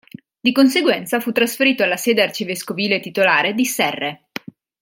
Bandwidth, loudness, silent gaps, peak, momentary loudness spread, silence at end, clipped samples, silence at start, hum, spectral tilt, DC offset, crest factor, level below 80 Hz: 17 kHz; -17 LUFS; none; -2 dBFS; 11 LU; 0.65 s; under 0.1%; 0.45 s; none; -3.5 dB/octave; under 0.1%; 18 dB; -68 dBFS